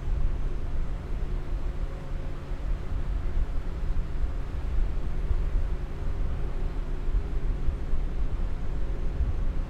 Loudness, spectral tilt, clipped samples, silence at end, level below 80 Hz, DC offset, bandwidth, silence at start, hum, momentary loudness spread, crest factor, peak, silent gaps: -34 LUFS; -8 dB/octave; under 0.1%; 0 s; -28 dBFS; under 0.1%; 5.2 kHz; 0 s; none; 4 LU; 14 dB; -12 dBFS; none